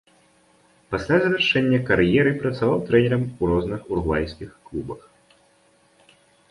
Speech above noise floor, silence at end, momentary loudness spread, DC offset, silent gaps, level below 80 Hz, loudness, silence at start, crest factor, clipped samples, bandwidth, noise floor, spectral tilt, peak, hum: 38 dB; 1.55 s; 15 LU; under 0.1%; none; -42 dBFS; -21 LUFS; 0.9 s; 18 dB; under 0.1%; 11.5 kHz; -59 dBFS; -7 dB/octave; -4 dBFS; none